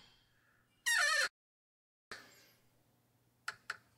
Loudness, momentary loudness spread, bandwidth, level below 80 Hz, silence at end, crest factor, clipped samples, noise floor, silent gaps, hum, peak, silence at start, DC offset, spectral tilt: -33 LUFS; 23 LU; 16 kHz; -86 dBFS; 0.25 s; 20 dB; under 0.1%; -75 dBFS; 1.30-2.11 s; none; -22 dBFS; 0.85 s; under 0.1%; 2 dB/octave